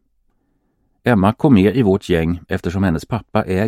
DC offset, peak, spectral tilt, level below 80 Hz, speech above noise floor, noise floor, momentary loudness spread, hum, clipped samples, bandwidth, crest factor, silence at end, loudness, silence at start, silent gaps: under 0.1%; 0 dBFS; -8 dB/octave; -40 dBFS; 49 dB; -64 dBFS; 10 LU; none; under 0.1%; 14 kHz; 16 dB; 0 s; -17 LUFS; 1.05 s; none